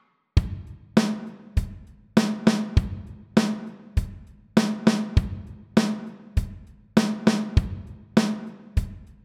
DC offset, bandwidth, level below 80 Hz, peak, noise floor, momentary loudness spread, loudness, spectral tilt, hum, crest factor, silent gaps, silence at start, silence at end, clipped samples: under 0.1%; 14 kHz; -32 dBFS; -4 dBFS; -43 dBFS; 14 LU; -25 LUFS; -6.5 dB/octave; none; 22 dB; none; 0.35 s; 0.2 s; under 0.1%